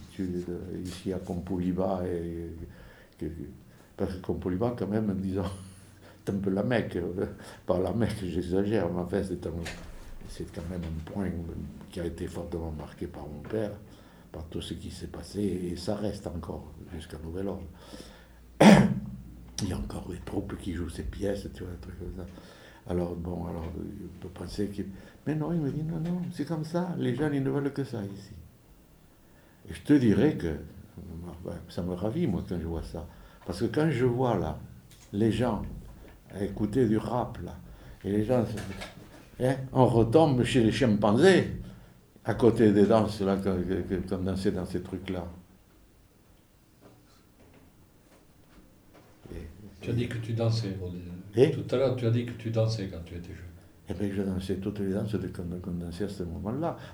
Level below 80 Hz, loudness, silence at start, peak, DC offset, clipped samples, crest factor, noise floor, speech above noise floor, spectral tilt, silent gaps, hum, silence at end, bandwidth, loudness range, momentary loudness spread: -48 dBFS; -29 LUFS; 0 s; -2 dBFS; under 0.1%; under 0.1%; 28 dB; -60 dBFS; 30 dB; -7 dB/octave; none; none; 0 s; over 20 kHz; 12 LU; 19 LU